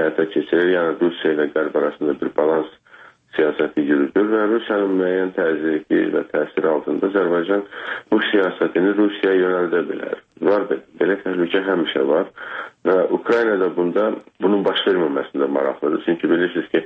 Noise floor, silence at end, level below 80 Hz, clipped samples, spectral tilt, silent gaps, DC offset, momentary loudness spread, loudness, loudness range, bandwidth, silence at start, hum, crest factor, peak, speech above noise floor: -47 dBFS; 0 s; -66 dBFS; under 0.1%; -7.5 dB/octave; none; under 0.1%; 5 LU; -19 LUFS; 1 LU; 5.4 kHz; 0 s; none; 14 dB; -4 dBFS; 28 dB